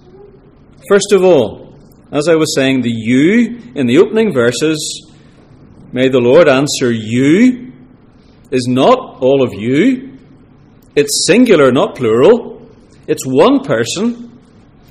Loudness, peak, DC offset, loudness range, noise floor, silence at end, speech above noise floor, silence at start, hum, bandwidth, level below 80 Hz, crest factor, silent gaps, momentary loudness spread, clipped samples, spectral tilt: -11 LUFS; 0 dBFS; under 0.1%; 2 LU; -43 dBFS; 0.6 s; 32 dB; 0.85 s; none; 14.5 kHz; -48 dBFS; 12 dB; none; 11 LU; under 0.1%; -5 dB/octave